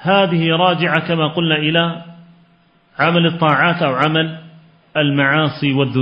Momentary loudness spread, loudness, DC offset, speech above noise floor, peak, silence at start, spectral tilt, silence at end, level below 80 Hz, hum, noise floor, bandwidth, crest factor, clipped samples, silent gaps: 8 LU; -15 LUFS; under 0.1%; 39 dB; 0 dBFS; 0 s; -8 dB/octave; 0 s; -60 dBFS; none; -54 dBFS; 5.6 kHz; 16 dB; under 0.1%; none